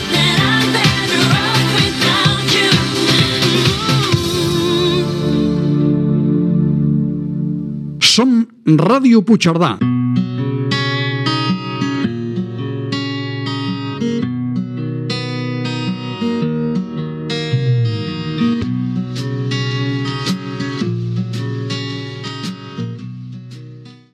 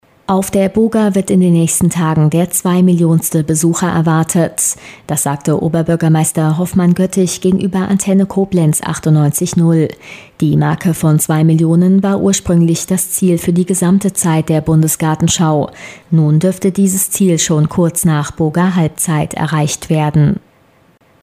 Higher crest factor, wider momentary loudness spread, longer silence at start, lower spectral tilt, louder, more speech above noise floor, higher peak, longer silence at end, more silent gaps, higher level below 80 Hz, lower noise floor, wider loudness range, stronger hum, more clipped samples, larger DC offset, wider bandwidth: first, 16 dB vs 10 dB; first, 11 LU vs 4 LU; second, 0 s vs 0.3 s; about the same, -5 dB/octave vs -6 dB/octave; second, -16 LUFS vs -13 LUFS; second, 25 dB vs 38 dB; about the same, 0 dBFS vs -2 dBFS; second, 0.15 s vs 0.85 s; neither; about the same, -44 dBFS vs -42 dBFS; second, -36 dBFS vs -50 dBFS; first, 8 LU vs 2 LU; neither; neither; neither; about the same, 15 kHz vs 16 kHz